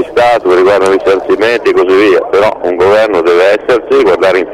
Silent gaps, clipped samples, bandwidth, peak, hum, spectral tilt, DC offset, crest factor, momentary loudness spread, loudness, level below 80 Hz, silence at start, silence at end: none; under 0.1%; 12 kHz; -2 dBFS; none; -5 dB/octave; under 0.1%; 6 dB; 3 LU; -8 LUFS; -42 dBFS; 0 s; 0 s